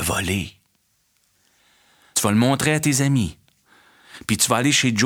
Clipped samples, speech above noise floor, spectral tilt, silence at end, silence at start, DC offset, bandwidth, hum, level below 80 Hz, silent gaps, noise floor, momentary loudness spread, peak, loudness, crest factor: under 0.1%; 47 dB; -3.5 dB/octave; 0 s; 0 s; under 0.1%; 19.5 kHz; none; -48 dBFS; none; -66 dBFS; 10 LU; -2 dBFS; -20 LUFS; 20 dB